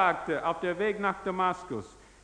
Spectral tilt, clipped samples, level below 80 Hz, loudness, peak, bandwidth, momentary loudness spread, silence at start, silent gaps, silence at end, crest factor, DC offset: -5.5 dB/octave; under 0.1%; -60 dBFS; -30 LUFS; -10 dBFS; 10.5 kHz; 11 LU; 0 s; none; 0.25 s; 20 dB; under 0.1%